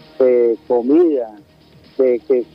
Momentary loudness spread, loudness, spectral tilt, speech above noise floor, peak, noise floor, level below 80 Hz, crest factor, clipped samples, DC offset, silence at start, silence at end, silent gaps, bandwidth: 11 LU; -16 LUFS; -8.5 dB/octave; 32 dB; -2 dBFS; -47 dBFS; -62 dBFS; 14 dB; under 0.1%; under 0.1%; 0.2 s; 0.1 s; none; 5.4 kHz